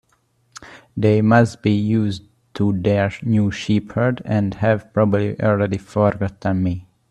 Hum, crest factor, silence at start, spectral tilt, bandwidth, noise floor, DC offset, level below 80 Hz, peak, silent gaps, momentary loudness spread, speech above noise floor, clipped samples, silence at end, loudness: none; 18 dB; 0.6 s; -8 dB/octave; 9.8 kHz; -63 dBFS; under 0.1%; -50 dBFS; 0 dBFS; none; 9 LU; 45 dB; under 0.1%; 0.3 s; -19 LUFS